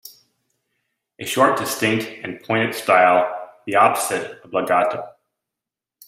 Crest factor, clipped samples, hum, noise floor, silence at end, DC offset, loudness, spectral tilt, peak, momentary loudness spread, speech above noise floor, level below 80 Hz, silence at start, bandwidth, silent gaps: 20 dB; under 0.1%; none; -87 dBFS; 1 s; under 0.1%; -19 LUFS; -3.5 dB/octave; -2 dBFS; 16 LU; 68 dB; -66 dBFS; 0.05 s; 16 kHz; none